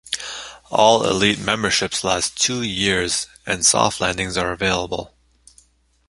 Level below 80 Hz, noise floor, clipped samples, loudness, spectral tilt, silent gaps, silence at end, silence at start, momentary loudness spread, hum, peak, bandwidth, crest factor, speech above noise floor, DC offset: -46 dBFS; -56 dBFS; under 0.1%; -19 LUFS; -2.5 dB/octave; none; 1 s; 0.05 s; 11 LU; none; 0 dBFS; 11.5 kHz; 20 dB; 36 dB; under 0.1%